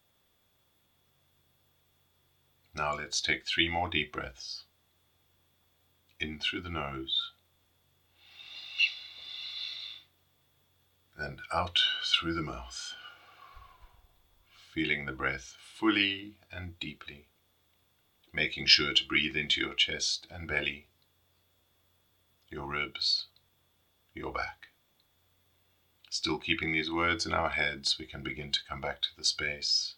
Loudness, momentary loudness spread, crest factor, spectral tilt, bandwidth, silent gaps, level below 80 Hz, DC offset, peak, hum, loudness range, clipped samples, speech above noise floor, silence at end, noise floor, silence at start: -30 LUFS; 17 LU; 30 dB; -2.5 dB/octave; 18 kHz; none; -58 dBFS; under 0.1%; -6 dBFS; none; 9 LU; under 0.1%; 39 dB; 0.05 s; -71 dBFS; 2.75 s